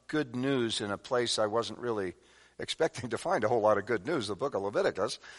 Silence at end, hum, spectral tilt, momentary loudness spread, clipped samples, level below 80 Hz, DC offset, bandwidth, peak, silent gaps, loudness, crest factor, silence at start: 0 s; none; -4.5 dB/octave; 8 LU; under 0.1%; -68 dBFS; under 0.1%; 11.5 kHz; -14 dBFS; none; -31 LUFS; 18 dB; 0.1 s